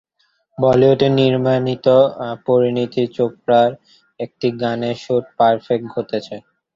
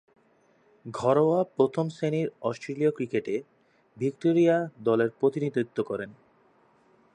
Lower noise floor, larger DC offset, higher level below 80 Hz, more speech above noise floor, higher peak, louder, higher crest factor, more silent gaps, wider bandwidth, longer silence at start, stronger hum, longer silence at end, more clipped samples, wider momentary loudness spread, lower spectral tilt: about the same, -64 dBFS vs -64 dBFS; neither; first, -56 dBFS vs -72 dBFS; first, 48 dB vs 38 dB; first, -2 dBFS vs -8 dBFS; first, -17 LUFS vs -27 LUFS; about the same, 16 dB vs 18 dB; neither; second, 7.4 kHz vs 10 kHz; second, 0.6 s vs 0.85 s; neither; second, 0.35 s vs 1.05 s; neither; about the same, 12 LU vs 11 LU; about the same, -8 dB/octave vs -7.5 dB/octave